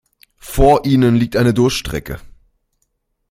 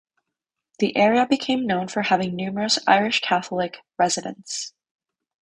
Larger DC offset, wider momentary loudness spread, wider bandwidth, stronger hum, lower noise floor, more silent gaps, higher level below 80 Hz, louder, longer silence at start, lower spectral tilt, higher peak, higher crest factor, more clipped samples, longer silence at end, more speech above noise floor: neither; first, 15 LU vs 12 LU; first, 16.5 kHz vs 10.5 kHz; neither; second, -68 dBFS vs -84 dBFS; neither; first, -28 dBFS vs -64 dBFS; first, -15 LUFS vs -22 LUFS; second, 0.45 s vs 0.8 s; first, -6.5 dB/octave vs -3.5 dB/octave; about the same, -2 dBFS vs -4 dBFS; second, 14 dB vs 20 dB; neither; first, 1.1 s vs 0.7 s; second, 55 dB vs 62 dB